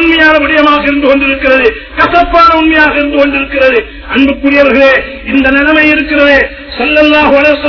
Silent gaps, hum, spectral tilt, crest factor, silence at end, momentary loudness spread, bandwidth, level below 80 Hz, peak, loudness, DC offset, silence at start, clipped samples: none; none; -5.5 dB/octave; 8 dB; 0 s; 6 LU; 5.4 kHz; -28 dBFS; 0 dBFS; -7 LUFS; under 0.1%; 0 s; 5%